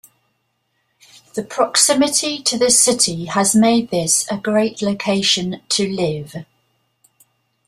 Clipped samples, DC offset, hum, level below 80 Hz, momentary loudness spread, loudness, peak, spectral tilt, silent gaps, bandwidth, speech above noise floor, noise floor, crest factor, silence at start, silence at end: under 0.1%; under 0.1%; none; -58 dBFS; 13 LU; -16 LUFS; 0 dBFS; -2.5 dB/octave; none; 15.5 kHz; 51 dB; -68 dBFS; 18 dB; 1.35 s; 1.25 s